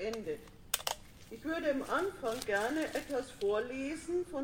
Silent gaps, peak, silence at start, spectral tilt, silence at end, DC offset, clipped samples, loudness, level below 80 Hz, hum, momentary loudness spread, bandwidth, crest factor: none; -12 dBFS; 0 s; -3 dB/octave; 0 s; under 0.1%; under 0.1%; -36 LUFS; -60 dBFS; none; 10 LU; 16.5 kHz; 24 dB